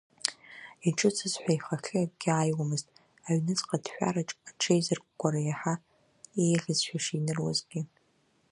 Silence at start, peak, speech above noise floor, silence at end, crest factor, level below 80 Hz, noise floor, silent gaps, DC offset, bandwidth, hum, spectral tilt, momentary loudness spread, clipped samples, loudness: 0.25 s; -4 dBFS; 40 dB; 0.65 s; 28 dB; -72 dBFS; -70 dBFS; none; under 0.1%; 11.5 kHz; none; -4.5 dB/octave; 11 LU; under 0.1%; -30 LUFS